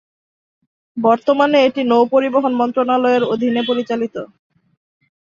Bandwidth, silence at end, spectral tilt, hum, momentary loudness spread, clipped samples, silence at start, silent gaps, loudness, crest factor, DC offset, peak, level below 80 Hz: 7.2 kHz; 1.05 s; -6 dB/octave; none; 10 LU; under 0.1%; 0.95 s; none; -16 LUFS; 16 dB; under 0.1%; -2 dBFS; -64 dBFS